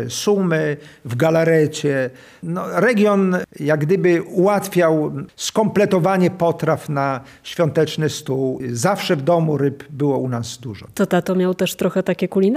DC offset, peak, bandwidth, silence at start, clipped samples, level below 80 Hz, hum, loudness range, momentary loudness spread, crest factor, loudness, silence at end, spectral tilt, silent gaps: under 0.1%; -4 dBFS; 15.5 kHz; 0 s; under 0.1%; -60 dBFS; none; 3 LU; 10 LU; 14 dB; -19 LUFS; 0 s; -6 dB/octave; none